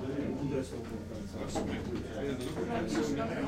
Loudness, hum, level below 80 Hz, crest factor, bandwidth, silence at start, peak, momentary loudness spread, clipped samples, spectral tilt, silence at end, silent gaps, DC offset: -36 LUFS; none; -52 dBFS; 14 dB; 16 kHz; 0 s; -20 dBFS; 8 LU; under 0.1%; -6 dB/octave; 0 s; none; under 0.1%